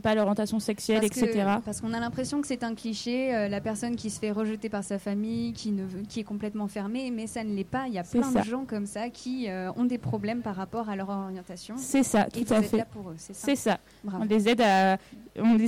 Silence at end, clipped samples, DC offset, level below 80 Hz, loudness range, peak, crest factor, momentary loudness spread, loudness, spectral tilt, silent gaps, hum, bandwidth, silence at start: 0 s; under 0.1%; under 0.1%; -58 dBFS; 6 LU; -16 dBFS; 12 dB; 10 LU; -29 LUFS; -5 dB/octave; none; none; 16 kHz; 0.05 s